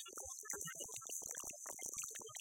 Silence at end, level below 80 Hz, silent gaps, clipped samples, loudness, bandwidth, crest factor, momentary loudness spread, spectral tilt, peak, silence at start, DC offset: 0 s; -76 dBFS; none; under 0.1%; -46 LUFS; 17 kHz; 22 dB; 3 LU; -0.5 dB/octave; -26 dBFS; 0 s; under 0.1%